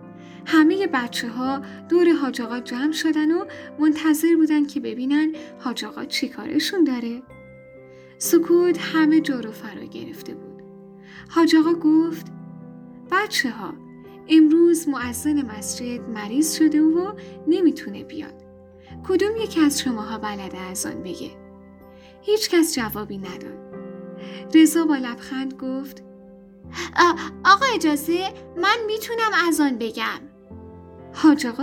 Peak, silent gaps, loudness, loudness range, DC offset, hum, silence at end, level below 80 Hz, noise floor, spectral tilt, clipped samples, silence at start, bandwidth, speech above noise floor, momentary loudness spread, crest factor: -2 dBFS; none; -21 LUFS; 5 LU; under 0.1%; none; 0 s; -60 dBFS; -46 dBFS; -3.5 dB/octave; under 0.1%; 0 s; 18.5 kHz; 25 dB; 19 LU; 20 dB